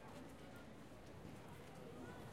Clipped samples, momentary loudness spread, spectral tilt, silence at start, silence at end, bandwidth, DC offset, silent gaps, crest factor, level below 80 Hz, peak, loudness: under 0.1%; 4 LU; -5.5 dB/octave; 0 s; 0 s; 16 kHz; under 0.1%; none; 14 dB; -70 dBFS; -40 dBFS; -57 LUFS